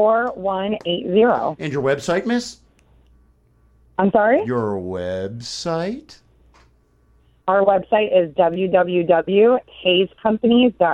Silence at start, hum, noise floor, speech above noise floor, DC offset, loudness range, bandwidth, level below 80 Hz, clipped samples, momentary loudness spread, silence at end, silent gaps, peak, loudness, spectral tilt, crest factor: 0 s; none; -57 dBFS; 39 dB; under 0.1%; 6 LU; 11 kHz; -54 dBFS; under 0.1%; 11 LU; 0 s; none; -2 dBFS; -19 LUFS; -5.5 dB/octave; 16 dB